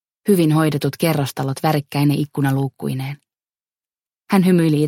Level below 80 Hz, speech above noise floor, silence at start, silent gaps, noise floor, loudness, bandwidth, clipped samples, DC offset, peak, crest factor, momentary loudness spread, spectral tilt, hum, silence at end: -60 dBFS; over 73 dB; 0.25 s; none; under -90 dBFS; -19 LUFS; 17 kHz; under 0.1%; under 0.1%; 0 dBFS; 18 dB; 10 LU; -6.5 dB/octave; none; 0 s